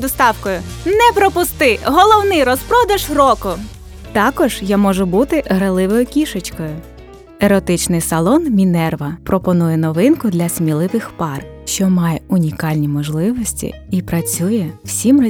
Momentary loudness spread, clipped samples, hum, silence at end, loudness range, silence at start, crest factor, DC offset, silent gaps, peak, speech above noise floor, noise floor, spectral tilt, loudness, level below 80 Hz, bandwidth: 10 LU; under 0.1%; none; 0 s; 5 LU; 0 s; 14 dB; under 0.1%; none; 0 dBFS; 20 dB; -35 dBFS; -5.5 dB/octave; -15 LUFS; -36 dBFS; 19.5 kHz